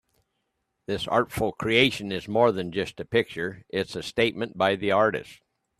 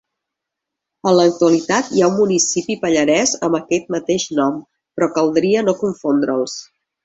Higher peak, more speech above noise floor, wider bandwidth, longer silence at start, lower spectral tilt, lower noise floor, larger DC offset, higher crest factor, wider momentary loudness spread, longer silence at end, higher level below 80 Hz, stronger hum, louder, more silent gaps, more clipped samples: about the same, -4 dBFS vs -2 dBFS; second, 52 dB vs 65 dB; first, 14.5 kHz vs 8.2 kHz; second, 0.9 s vs 1.05 s; about the same, -5 dB/octave vs -4 dB/octave; second, -78 dBFS vs -82 dBFS; neither; first, 22 dB vs 16 dB; first, 10 LU vs 7 LU; about the same, 0.45 s vs 0.4 s; about the same, -56 dBFS vs -58 dBFS; neither; second, -25 LUFS vs -17 LUFS; neither; neither